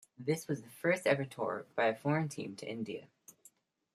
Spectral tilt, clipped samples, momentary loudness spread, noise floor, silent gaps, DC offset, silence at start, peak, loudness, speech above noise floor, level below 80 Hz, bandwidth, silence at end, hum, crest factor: -5.5 dB/octave; under 0.1%; 11 LU; -66 dBFS; none; under 0.1%; 0.2 s; -16 dBFS; -35 LUFS; 31 dB; -82 dBFS; 15 kHz; 0.65 s; none; 20 dB